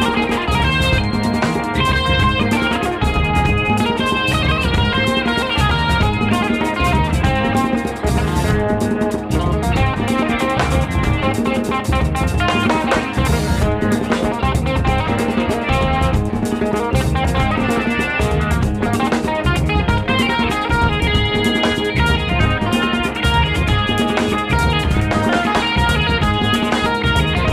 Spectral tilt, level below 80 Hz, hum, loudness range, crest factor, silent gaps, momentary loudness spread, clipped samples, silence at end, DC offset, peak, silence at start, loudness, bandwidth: -5.5 dB/octave; -24 dBFS; none; 2 LU; 12 dB; none; 3 LU; under 0.1%; 0 s; under 0.1%; -4 dBFS; 0 s; -17 LUFS; 15.5 kHz